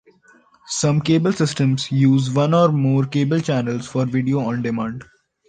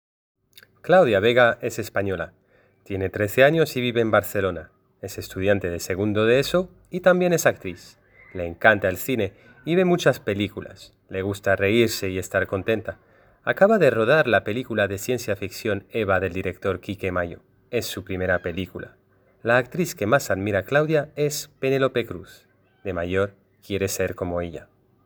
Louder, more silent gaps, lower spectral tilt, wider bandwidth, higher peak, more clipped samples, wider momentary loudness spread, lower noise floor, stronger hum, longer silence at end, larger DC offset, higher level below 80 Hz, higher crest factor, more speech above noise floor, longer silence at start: first, -19 LUFS vs -22 LUFS; neither; first, -6.5 dB/octave vs -5 dB/octave; second, 9.6 kHz vs over 20 kHz; about the same, -2 dBFS vs 0 dBFS; neither; second, 8 LU vs 16 LU; about the same, -54 dBFS vs -51 dBFS; neither; about the same, 0.45 s vs 0.4 s; neither; about the same, -56 dBFS vs -54 dBFS; second, 16 dB vs 24 dB; first, 35 dB vs 29 dB; second, 0.65 s vs 0.85 s